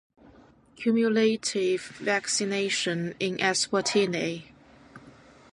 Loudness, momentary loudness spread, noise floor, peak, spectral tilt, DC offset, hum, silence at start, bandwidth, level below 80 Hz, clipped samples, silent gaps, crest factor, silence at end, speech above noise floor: -26 LUFS; 7 LU; -55 dBFS; -10 dBFS; -3.5 dB/octave; under 0.1%; none; 0.8 s; 11.5 kHz; -68 dBFS; under 0.1%; none; 18 dB; 0.45 s; 29 dB